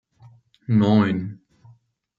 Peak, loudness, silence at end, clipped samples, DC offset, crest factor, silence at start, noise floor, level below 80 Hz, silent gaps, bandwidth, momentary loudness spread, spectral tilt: -4 dBFS; -20 LUFS; 0.85 s; under 0.1%; under 0.1%; 18 dB; 0.7 s; -55 dBFS; -64 dBFS; none; 7 kHz; 19 LU; -9 dB/octave